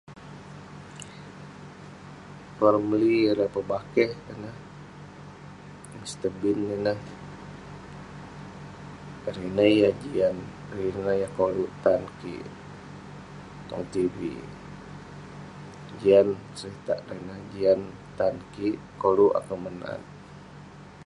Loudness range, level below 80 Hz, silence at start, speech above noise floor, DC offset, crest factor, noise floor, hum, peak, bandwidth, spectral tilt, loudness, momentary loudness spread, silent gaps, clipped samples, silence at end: 7 LU; -56 dBFS; 0.1 s; 20 dB; under 0.1%; 22 dB; -46 dBFS; 50 Hz at -60 dBFS; -6 dBFS; 11.5 kHz; -6.5 dB/octave; -26 LUFS; 23 LU; none; under 0.1%; 0 s